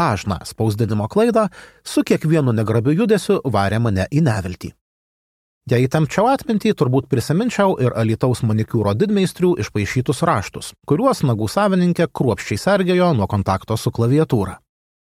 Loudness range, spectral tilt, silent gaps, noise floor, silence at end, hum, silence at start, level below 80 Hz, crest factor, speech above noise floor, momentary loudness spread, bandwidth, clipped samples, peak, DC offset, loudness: 2 LU; -7 dB/octave; 4.81-5.61 s; under -90 dBFS; 0.6 s; none; 0 s; -48 dBFS; 16 dB; over 73 dB; 6 LU; 15.5 kHz; under 0.1%; -2 dBFS; under 0.1%; -18 LUFS